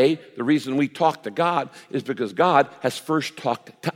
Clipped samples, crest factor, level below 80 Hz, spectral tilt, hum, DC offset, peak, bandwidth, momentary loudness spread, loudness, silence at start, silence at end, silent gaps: under 0.1%; 20 dB; -76 dBFS; -5.5 dB/octave; none; under 0.1%; -2 dBFS; 16 kHz; 9 LU; -23 LUFS; 0 s; 0.05 s; none